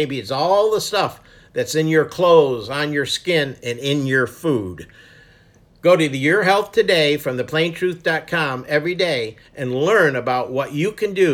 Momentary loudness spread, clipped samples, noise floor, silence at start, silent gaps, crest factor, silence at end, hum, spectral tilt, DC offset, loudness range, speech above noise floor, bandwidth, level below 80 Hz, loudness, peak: 9 LU; under 0.1%; -52 dBFS; 0 s; none; 18 dB; 0 s; none; -5 dB/octave; under 0.1%; 3 LU; 33 dB; 17 kHz; -56 dBFS; -18 LUFS; -2 dBFS